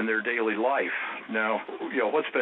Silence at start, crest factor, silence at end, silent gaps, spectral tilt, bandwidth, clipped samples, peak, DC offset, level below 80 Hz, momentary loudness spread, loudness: 0 s; 14 dB; 0 s; none; -8 dB/octave; 4.1 kHz; under 0.1%; -12 dBFS; under 0.1%; under -90 dBFS; 6 LU; -27 LUFS